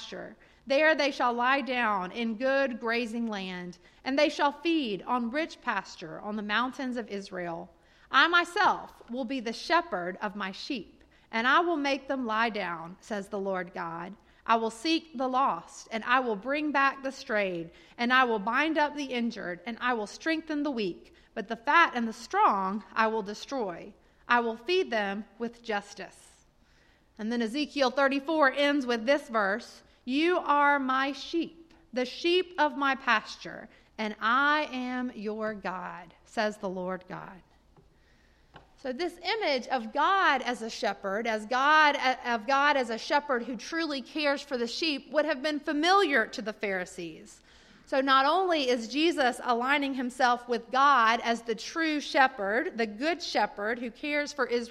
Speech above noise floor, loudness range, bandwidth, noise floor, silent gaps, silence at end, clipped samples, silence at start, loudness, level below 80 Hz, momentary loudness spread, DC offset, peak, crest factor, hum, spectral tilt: 34 dB; 6 LU; 14 kHz; -63 dBFS; none; 0 s; under 0.1%; 0 s; -28 LUFS; -66 dBFS; 14 LU; under 0.1%; -8 dBFS; 22 dB; none; -3.5 dB/octave